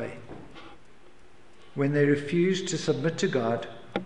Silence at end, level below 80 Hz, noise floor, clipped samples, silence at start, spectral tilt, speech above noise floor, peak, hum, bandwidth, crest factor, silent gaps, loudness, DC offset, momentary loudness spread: 0 s; -64 dBFS; -56 dBFS; under 0.1%; 0 s; -5.5 dB/octave; 31 dB; -10 dBFS; none; 10.5 kHz; 18 dB; none; -27 LUFS; 0.5%; 21 LU